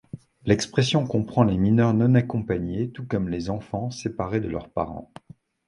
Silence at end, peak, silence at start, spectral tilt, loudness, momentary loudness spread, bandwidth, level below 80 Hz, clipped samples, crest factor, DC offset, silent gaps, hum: 0.65 s; -4 dBFS; 0.15 s; -6.5 dB/octave; -24 LUFS; 11 LU; 11 kHz; -46 dBFS; under 0.1%; 20 dB; under 0.1%; none; none